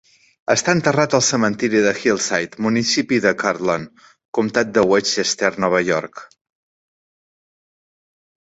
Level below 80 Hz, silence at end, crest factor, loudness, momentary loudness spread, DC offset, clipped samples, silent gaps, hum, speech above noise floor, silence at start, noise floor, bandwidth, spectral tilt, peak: -58 dBFS; 2.3 s; 18 dB; -18 LUFS; 7 LU; under 0.1%; under 0.1%; 4.25-4.33 s; none; over 72 dB; 0.5 s; under -90 dBFS; 8.2 kHz; -3.5 dB/octave; -2 dBFS